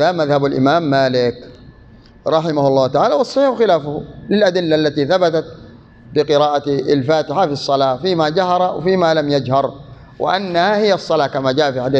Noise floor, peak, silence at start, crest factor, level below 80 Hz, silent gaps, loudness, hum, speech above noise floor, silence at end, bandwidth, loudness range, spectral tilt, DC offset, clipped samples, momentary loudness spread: -43 dBFS; -2 dBFS; 0 s; 14 dB; -50 dBFS; none; -16 LUFS; none; 28 dB; 0 s; 8.4 kHz; 1 LU; -6 dB/octave; under 0.1%; under 0.1%; 5 LU